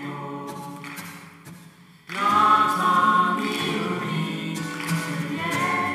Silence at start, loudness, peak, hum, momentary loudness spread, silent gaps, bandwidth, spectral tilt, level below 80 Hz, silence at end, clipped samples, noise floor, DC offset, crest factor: 0 s; -22 LUFS; -6 dBFS; none; 18 LU; none; 16 kHz; -4.5 dB/octave; -70 dBFS; 0 s; under 0.1%; -49 dBFS; under 0.1%; 18 dB